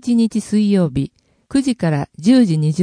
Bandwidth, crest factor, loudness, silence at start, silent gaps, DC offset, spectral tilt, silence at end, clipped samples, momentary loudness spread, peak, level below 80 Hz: 10.5 kHz; 14 dB; -17 LUFS; 0.05 s; none; under 0.1%; -7 dB/octave; 0 s; under 0.1%; 8 LU; -2 dBFS; -46 dBFS